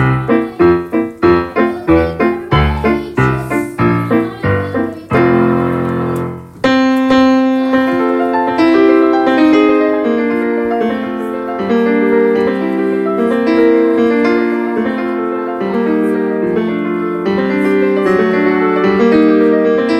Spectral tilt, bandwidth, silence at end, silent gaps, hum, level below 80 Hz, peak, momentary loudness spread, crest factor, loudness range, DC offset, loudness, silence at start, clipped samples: -8 dB/octave; 13 kHz; 0 s; none; none; -36 dBFS; 0 dBFS; 7 LU; 12 dB; 3 LU; under 0.1%; -13 LUFS; 0 s; under 0.1%